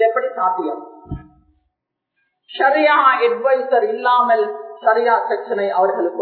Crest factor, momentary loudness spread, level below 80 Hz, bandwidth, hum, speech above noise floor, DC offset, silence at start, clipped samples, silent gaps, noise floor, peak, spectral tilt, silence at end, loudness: 16 dB; 19 LU; -50 dBFS; 4.6 kHz; none; 61 dB; under 0.1%; 0 s; under 0.1%; none; -77 dBFS; -2 dBFS; -8 dB/octave; 0 s; -16 LUFS